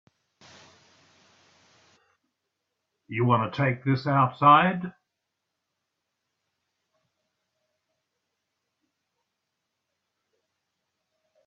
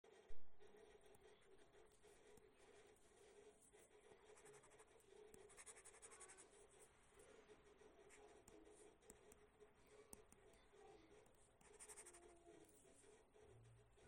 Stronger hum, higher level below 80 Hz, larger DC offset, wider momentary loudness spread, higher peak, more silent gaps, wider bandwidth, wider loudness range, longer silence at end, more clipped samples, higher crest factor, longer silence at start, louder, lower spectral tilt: neither; first, -70 dBFS vs -80 dBFS; neither; first, 17 LU vs 8 LU; first, -6 dBFS vs -38 dBFS; neither; second, 7 kHz vs 16.5 kHz; first, 8 LU vs 4 LU; first, 6.55 s vs 0 s; neither; about the same, 24 dB vs 22 dB; first, 3.1 s vs 0.05 s; first, -23 LUFS vs -66 LUFS; first, -8 dB/octave vs -3 dB/octave